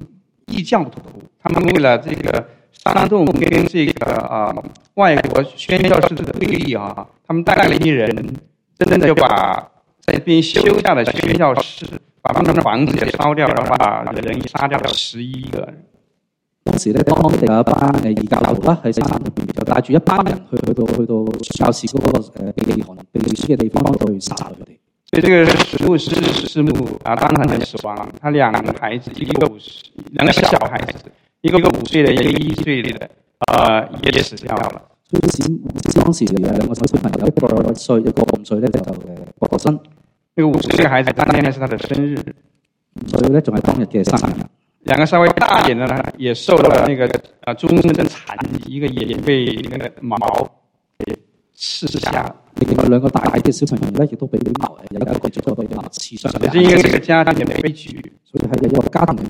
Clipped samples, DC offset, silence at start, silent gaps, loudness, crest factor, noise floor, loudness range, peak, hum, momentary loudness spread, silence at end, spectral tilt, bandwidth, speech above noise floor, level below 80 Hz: under 0.1%; under 0.1%; 0 s; none; -16 LUFS; 16 dB; -71 dBFS; 4 LU; 0 dBFS; none; 13 LU; 0 s; -6 dB/octave; 16.5 kHz; 56 dB; -38 dBFS